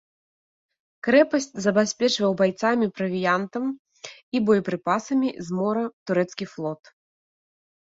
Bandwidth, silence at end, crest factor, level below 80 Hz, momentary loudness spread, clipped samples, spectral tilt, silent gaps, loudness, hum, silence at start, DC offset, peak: 8 kHz; 1.2 s; 20 dB; -68 dBFS; 11 LU; under 0.1%; -5 dB/octave; 3.79-3.85 s, 4.23-4.32 s, 5.93-6.06 s; -24 LUFS; none; 1.05 s; under 0.1%; -6 dBFS